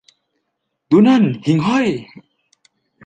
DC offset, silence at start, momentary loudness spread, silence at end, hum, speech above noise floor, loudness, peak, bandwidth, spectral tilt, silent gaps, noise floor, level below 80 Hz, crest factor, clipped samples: under 0.1%; 0.9 s; 9 LU; 1 s; none; 60 dB; -15 LUFS; -2 dBFS; 9 kHz; -7.5 dB/octave; none; -74 dBFS; -58 dBFS; 16 dB; under 0.1%